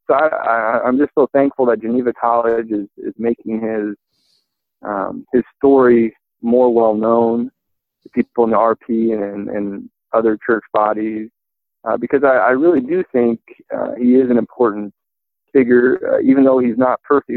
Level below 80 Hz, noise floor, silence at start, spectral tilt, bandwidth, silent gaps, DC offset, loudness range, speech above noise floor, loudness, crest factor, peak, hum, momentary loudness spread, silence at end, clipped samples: -58 dBFS; -80 dBFS; 0.1 s; -10.5 dB/octave; 4.2 kHz; none; under 0.1%; 5 LU; 65 dB; -16 LUFS; 14 dB; -2 dBFS; none; 12 LU; 0 s; under 0.1%